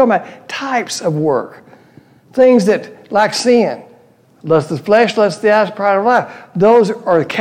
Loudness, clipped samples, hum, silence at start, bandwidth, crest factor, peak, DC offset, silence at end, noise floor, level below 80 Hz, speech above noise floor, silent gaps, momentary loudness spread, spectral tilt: -14 LUFS; under 0.1%; none; 0 s; 13.5 kHz; 12 dB; -2 dBFS; under 0.1%; 0 s; -48 dBFS; -62 dBFS; 35 dB; none; 12 LU; -5 dB/octave